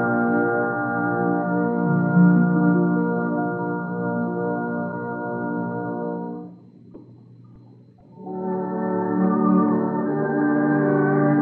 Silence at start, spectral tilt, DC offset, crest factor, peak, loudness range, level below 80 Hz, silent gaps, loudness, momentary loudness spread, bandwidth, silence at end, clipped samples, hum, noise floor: 0 s; -14 dB/octave; under 0.1%; 16 dB; -6 dBFS; 11 LU; -70 dBFS; none; -22 LUFS; 10 LU; 2.4 kHz; 0 s; under 0.1%; none; -48 dBFS